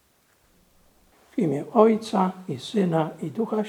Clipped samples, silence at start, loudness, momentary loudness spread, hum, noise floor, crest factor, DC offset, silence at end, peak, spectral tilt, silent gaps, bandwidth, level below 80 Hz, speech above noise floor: under 0.1%; 1.35 s; -24 LUFS; 11 LU; none; -63 dBFS; 22 dB; under 0.1%; 0 s; -2 dBFS; -7.5 dB/octave; none; 14 kHz; -70 dBFS; 40 dB